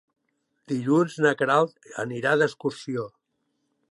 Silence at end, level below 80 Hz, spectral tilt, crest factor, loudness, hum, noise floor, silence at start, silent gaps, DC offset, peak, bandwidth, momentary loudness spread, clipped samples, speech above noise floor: 0.85 s; -74 dBFS; -6 dB/octave; 18 dB; -25 LUFS; none; -76 dBFS; 0.7 s; none; under 0.1%; -8 dBFS; 11.5 kHz; 11 LU; under 0.1%; 51 dB